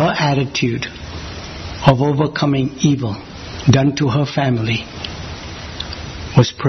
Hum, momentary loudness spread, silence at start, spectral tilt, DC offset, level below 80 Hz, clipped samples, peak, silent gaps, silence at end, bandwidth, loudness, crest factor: none; 15 LU; 0 s; -6 dB/octave; under 0.1%; -38 dBFS; under 0.1%; 0 dBFS; none; 0 s; 6.4 kHz; -17 LUFS; 18 dB